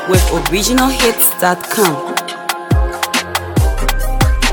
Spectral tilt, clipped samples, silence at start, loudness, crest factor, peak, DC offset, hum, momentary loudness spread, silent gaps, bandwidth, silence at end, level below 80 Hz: -4 dB/octave; under 0.1%; 0 s; -14 LUFS; 14 dB; 0 dBFS; under 0.1%; none; 8 LU; none; 19.5 kHz; 0 s; -20 dBFS